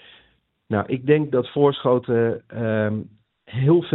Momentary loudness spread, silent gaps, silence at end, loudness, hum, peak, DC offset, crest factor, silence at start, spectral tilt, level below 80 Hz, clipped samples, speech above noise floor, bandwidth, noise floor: 8 LU; none; 0 s; -21 LUFS; none; -2 dBFS; under 0.1%; 18 dB; 0.7 s; -6.5 dB/octave; -60 dBFS; under 0.1%; 42 dB; 4.1 kHz; -62 dBFS